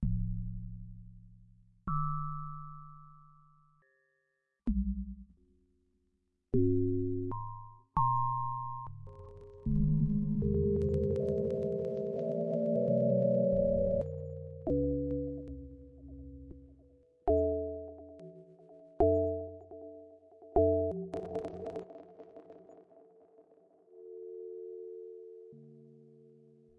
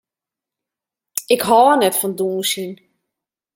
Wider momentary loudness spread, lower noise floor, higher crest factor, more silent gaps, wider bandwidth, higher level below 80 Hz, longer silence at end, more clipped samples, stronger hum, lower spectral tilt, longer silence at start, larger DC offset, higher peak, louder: first, 23 LU vs 15 LU; second, -81 dBFS vs -87 dBFS; about the same, 20 dB vs 20 dB; neither; second, 4.6 kHz vs 17 kHz; first, -48 dBFS vs -66 dBFS; about the same, 0.75 s vs 0.8 s; neither; neither; first, -12 dB/octave vs -3 dB/octave; second, 0 s vs 1.15 s; neither; second, -14 dBFS vs 0 dBFS; second, -33 LUFS vs -16 LUFS